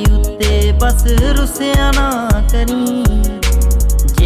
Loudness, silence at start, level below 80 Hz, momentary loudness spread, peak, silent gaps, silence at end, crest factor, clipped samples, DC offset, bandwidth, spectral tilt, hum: -14 LUFS; 0 s; -12 dBFS; 3 LU; -2 dBFS; none; 0 s; 8 dB; under 0.1%; 0.2%; 16 kHz; -5 dB/octave; none